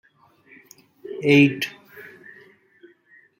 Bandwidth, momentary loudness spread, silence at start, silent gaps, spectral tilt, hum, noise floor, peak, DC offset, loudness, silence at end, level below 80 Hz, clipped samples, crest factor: 16 kHz; 27 LU; 1.05 s; none; -6 dB/octave; none; -56 dBFS; -4 dBFS; under 0.1%; -19 LUFS; 1.4 s; -70 dBFS; under 0.1%; 20 dB